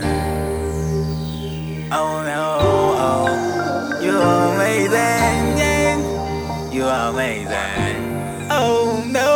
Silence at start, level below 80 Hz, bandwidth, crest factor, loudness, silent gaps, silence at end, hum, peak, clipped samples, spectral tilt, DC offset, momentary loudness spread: 0 s; -38 dBFS; over 20 kHz; 16 dB; -19 LUFS; none; 0 s; none; -2 dBFS; under 0.1%; -5 dB/octave; under 0.1%; 8 LU